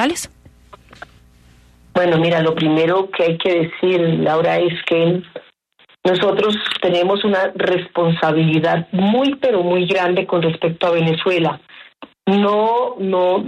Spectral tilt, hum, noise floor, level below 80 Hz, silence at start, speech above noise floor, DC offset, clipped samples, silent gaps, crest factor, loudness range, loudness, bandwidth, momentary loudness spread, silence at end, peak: -6 dB/octave; none; -54 dBFS; -56 dBFS; 0 s; 38 dB; under 0.1%; under 0.1%; none; 14 dB; 2 LU; -17 LUFS; 12.5 kHz; 4 LU; 0 s; -4 dBFS